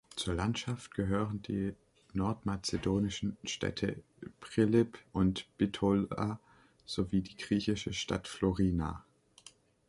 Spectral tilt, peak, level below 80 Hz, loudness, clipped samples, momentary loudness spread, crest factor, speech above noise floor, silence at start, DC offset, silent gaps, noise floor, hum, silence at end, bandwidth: -6 dB/octave; -16 dBFS; -52 dBFS; -34 LUFS; under 0.1%; 9 LU; 18 dB; 27 dB; 0.15 s; under 0.1%; none; -60 dBFS; none; 0.9 s; 11.5 kHz